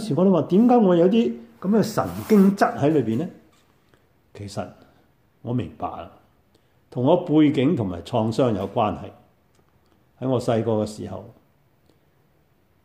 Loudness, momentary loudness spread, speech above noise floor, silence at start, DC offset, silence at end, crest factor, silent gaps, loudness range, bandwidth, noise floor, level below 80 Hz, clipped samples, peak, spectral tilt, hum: -21 LUFS; 18 LU; 42 dB; 0 s; under 0.1%; 1.6 s; 18 dB; none; 12 LU; 16 kHz; -62 dBFS; -58 dBFS; under 0.1%; -4 dBFS; -7.5 dB/octave; none